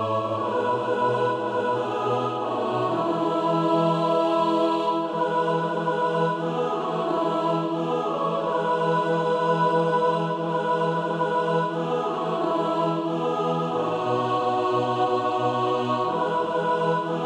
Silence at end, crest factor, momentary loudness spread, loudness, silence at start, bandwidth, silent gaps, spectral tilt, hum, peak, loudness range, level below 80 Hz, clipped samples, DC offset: 0 s; 14 dB; 4 LU; -24 LUFS; 0 s; 10.5 kHz; none; -7 dB/octave; none; -10 dBFS; 2 LU; -70 dBFS; under 0.1%; under 0.1%